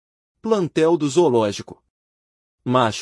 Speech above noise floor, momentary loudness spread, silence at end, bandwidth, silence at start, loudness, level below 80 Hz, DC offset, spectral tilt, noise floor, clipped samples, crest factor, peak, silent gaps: over 71 dB; 15 LU; 0 s; 11.5 kHz; 0.45 s; -19 LUFS; -64 dBFS; under 0.1%; -5.5 dB/octave; under -90 dBFS; under 0.1%; 18 dB; -4 dBFS; 1.90-2.58 s